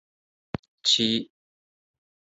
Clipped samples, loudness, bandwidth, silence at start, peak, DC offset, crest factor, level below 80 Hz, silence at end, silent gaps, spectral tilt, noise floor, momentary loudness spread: under 0.1%; -23 LUFS; 8.2 kHz; 0.85 s; -8 dBFS; under 0.1%; 22 dB; -60 dBFS; 1 s; none; -2.5 dB/octave; under -90 dBFS; 18 LU